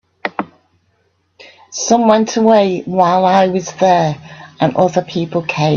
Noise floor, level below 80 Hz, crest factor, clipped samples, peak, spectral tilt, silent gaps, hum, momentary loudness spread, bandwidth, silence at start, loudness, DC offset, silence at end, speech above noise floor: -61 dBFS; -56 dBFS; 14 dB; under 0.1%; 0 dBFS; -5.5 dB/octave; none; none; 12 LU; 7.4 kHz; 0.25 s; -14 LUFS; under 0.1%; 0 s; 48 dB